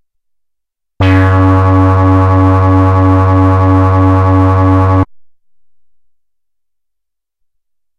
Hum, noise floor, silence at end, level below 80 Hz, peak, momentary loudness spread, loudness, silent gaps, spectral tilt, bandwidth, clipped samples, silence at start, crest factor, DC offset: none; -78 dBFS; 2.8 s; -36 dBFS; 0 dBFS; 2 LU; -9 LUFS; none; -9.5 dB/octave; 4.9 kHz; under 0.1%; 1 s; 10 dB; under 0.1%